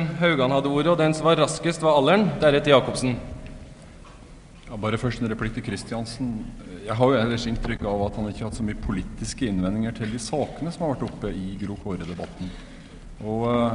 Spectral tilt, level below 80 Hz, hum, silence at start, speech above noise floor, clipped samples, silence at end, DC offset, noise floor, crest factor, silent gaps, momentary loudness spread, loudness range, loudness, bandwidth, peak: -5.5 dB/octave; -40 dBFS; none; 0 s; 21 dB; under 0.1%; 0 s; under 0.1%; -45 dBFS; 22 dB; none; 17 LU; 10 LU; -24 LUFS; 11 kHz; -4 dBFS